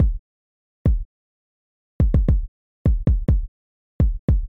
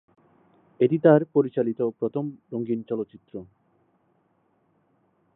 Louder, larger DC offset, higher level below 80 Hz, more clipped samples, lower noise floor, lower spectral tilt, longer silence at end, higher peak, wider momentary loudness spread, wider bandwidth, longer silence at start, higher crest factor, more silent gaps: about the same, -23 LUFS vs -24 LUFS; neither; first, -22 dBFS vs -72 dBFS; neither; first, under -90 dBFS vs -68 dBFS; about the same, -11.5 dB/octave vs -12.5 dB/octave; second, 0.1 s vs 1.95 s; second, -8 dBFS vs -4 dBFS; second, 16 LU vs 19 LU; second, 3.6 kHz vs 4 kHz; second, 0 s vs 0.8 s; second, 12 dB vs 22 dB; first, 0.19-0.85 s, 1.05-1.99 s, 2.48-2.85 s, 3.48-3.99 s, 4.19-4.28 s vs none